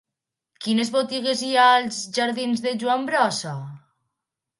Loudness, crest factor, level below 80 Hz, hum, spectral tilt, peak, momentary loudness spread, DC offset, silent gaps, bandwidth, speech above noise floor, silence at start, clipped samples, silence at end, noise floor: -21 LUFS; 18 dB; -74 dBFS; none; -3.5 dB/octave; -4 dBFS; 15 LU; under 0.1%; none; 11.5 kHz; 64 dB; 0.6 s; under 0.1%; 0.8 s; -85 dBFS